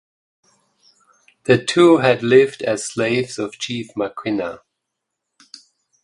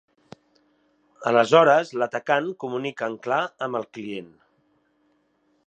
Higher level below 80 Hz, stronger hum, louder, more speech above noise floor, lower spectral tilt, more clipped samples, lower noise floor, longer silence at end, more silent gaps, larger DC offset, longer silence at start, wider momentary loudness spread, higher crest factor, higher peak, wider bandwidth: first, -60 dBFS vs -76 dBFS; neither; first, -18 LUFS vs -23 LUFS; first, 62 dB vs 45 dB; about the same, -5 dB/octave vs -5 dB/octave; neither; first, -79 dBFS vs -67 dBFS; about the same, 1.5 s vs 1.45 s; neither; neither; first, 1.5 s vs 1.2 s; second, 13 LU vs 17 LU; about the same, 20 dB vs 22 dB; about the same, 0 dBFS vs -2 dBFS; first, 11.5 kHz vs 9 kHz